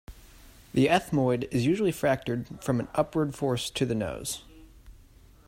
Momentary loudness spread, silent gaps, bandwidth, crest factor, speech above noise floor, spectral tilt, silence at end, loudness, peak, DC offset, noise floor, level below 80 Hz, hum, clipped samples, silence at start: 9 LU; none; 16 kHz; 20 dB; 27 dB; -5.5 dB/octave; 0.55 s; -28 LUFS; -10 dBFS; under 0.1%; -54 dBFS; -52 dBFS; none; under 0.1%; 0.1 s